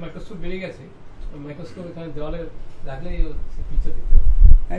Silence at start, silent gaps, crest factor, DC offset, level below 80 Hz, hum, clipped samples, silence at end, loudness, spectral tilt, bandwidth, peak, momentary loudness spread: 0 s; none; 14 dB; under 0.1%; -18 dBFS; none; under 0.1%; 0 s; -26 LUFS; -8.5 dB/octave; 4 kHz; 0 dBFS; 21 LU